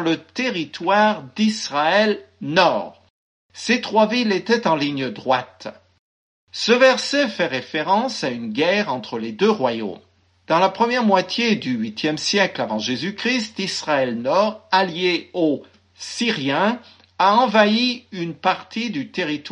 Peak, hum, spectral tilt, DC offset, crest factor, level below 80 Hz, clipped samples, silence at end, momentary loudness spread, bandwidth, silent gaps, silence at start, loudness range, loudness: -2 dBFS; none; -4 dB/octave; under 0.1%; 18 dB; -70 dBFS; under 0.1%; 0 s; 9 LU; 10.5 kHz; 3.10-3.49 s, 5.99-6.47 s; 0 s; 2 LU; -20 LUFS